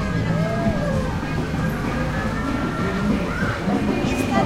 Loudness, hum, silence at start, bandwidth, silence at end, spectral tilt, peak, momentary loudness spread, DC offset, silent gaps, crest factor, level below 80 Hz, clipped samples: -23 LUFS; none; 0 s; 16 kHz; 0 s; -6.5 dB/octave; -4 dBFS; 3 LU; under 0.1%; none; 18 dB; -32 dBFS; under 0.1%